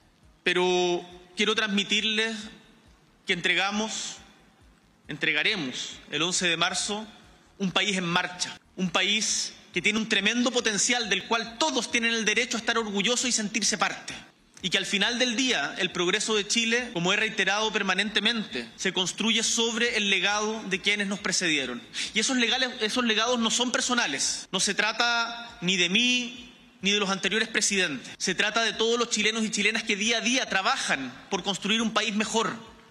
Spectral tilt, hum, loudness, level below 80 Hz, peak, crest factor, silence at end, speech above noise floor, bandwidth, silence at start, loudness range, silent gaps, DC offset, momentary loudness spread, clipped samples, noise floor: -2 dB/octave; none; -25 LUFS; -64 dBFS; -6 dBFS; 22 dB; 0.15 s; 32 dB; 13.5 kHz; 0.45 s; 3 LU; none; under 0.1%; 8 LU; under 0.1%; -58 dBFS